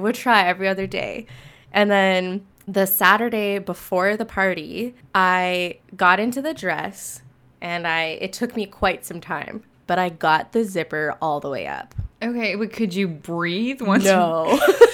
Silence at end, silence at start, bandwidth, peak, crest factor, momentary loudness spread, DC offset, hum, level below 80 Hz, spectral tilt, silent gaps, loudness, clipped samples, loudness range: 0 s; 0 s; over 20 kHz; 0 dBFS; 20 dB; 13 LU; under 0.1%; none; -50 dBFS; -4.5 dB/octave; none; -21 LUFS; under 0.1%; 5 LU